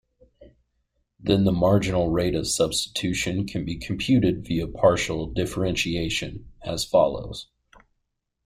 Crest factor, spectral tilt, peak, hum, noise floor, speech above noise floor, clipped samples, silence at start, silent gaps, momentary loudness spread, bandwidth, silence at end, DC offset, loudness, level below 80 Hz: 20 dB; -5 dB/octave; -4 dBFS; none; -78 dBFS; 54 dB; under 0.1%; 0.4 s; none; 11 LU; 16 kHz; 1.05 s; under 0.1%; -24 LUFS; -44 dBFS